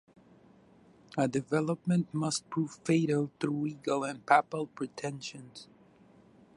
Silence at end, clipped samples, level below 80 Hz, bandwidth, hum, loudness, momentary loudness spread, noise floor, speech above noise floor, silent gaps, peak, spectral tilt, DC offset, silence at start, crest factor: 0.9 s; under 0.1%; -74 dBFS; 11.5 kHz; none; -32 LUFS; 14 LU; -60 dBFS; 29 dB; none; -8 dBFS; -5.5 dB/octave; under 0.1%; 1.15 s; 24 dB